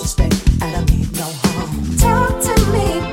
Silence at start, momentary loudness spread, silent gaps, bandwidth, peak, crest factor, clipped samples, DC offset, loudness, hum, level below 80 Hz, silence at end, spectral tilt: 0 s; 5 LU; none; 17 kHz; 0 dBFS; 14 dB; under 0.1%; under 0.1%; -17 LUFS; none; -20 dBFS; 0 s; -5 dB/octave